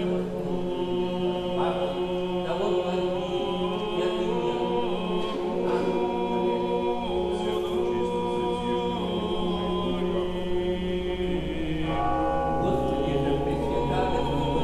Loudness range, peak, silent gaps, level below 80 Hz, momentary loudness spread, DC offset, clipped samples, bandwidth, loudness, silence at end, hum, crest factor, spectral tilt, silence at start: 1 LU; -12 dBFS; none; -42 dBFS; 3 LU; under 0.1%; under 0.1%; 12 kHz; -27 LUFS; 0 s; none; 14 dB; -7 dB/octave; 0 s